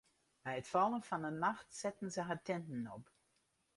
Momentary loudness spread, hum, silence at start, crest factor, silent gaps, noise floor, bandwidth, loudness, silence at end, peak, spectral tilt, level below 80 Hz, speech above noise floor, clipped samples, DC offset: 11 LU; none; 0.45 s; 20 dB; none; -80 dBFS; 11.5 kHz; -41 LUFS; 0.75 s; -20 dBFS; -5 dB/octave; -78 dBFS; 40 dB; under 0.1%; under 0.1%